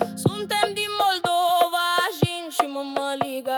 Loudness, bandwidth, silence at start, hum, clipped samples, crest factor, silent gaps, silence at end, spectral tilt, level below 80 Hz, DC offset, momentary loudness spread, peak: -23 LUFS; over 20 kHz; 0 s; none; under 0.1%; 18 dB; none; 0 s; -4 dB/octave; -60 dBFS; under 0.1%; 6 LU; -6 dBFS